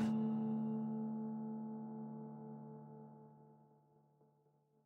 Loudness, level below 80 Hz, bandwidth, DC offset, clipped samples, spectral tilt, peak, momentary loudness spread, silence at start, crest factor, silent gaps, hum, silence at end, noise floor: -43 LUFS; -86 dBFS; 5.8 kHz; under 0.1%; under 0.1%; -9 dB/octave; -28 dBFS; 20 LU; 0 s; 16 dB; none; none; 1.2 s; -75 dBFS